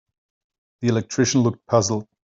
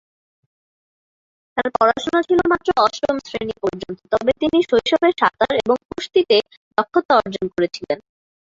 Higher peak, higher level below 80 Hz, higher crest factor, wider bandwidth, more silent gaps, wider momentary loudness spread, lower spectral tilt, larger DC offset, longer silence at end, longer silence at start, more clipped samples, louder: about the same, -4 dBFS vs -2 dBFS; second, -60 dBFS vs -52 dBFS; about the same, 20 dB vs 18 dB; about the same, 7.8 kHz vs 7.8 kHz; second, none vs 5.85-5.89 s, 6.57-6.71 s, 7.05-7.09 s; second, 6 LU vs 9 LU; about the same, -5 dB/octave vs -5 dB/octave; neither; second, 0.25 s vs 0.5 s; second, 0.8 s vs 1.55 s; neither; about the same, -21 LUFS vs -19 LUFS